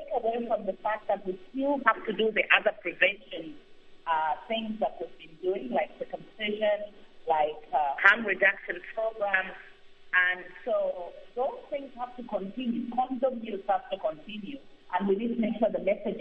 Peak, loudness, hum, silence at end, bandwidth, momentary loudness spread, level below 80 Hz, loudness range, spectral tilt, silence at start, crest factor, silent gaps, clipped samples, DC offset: -2 dBFS; -29 LUFS; none; 0 s; 7 kHz; 17 LU; -60 dBFS; 6 LU; -6.5 dB/octave; 0 s; 28 dB; none; under 0.1%; under 0.1%